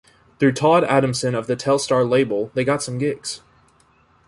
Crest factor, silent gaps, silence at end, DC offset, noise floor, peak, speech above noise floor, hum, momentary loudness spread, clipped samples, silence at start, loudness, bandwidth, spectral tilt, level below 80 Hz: 18 dB; none; 0.9 s; under 0.1%; -57 dBFS; -4 dBFS; 38 dB; none; 8 LU; under 0.1%; 0.4 s; -19 LUFS; 11.5 kHz; -5 dB/octave; -58 dBFS